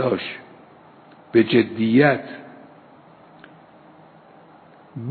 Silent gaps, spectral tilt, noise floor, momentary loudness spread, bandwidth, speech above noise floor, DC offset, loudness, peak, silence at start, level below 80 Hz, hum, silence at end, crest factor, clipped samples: none; -10 dB/octave; -49 dBFS; 23 LU; 4.6 kHz; 30 dB; under 0.1%; -19 LUFS; -4 dBFS; 0 s; -68 dBFS; none; 0 s; 20 dB; under 0.1%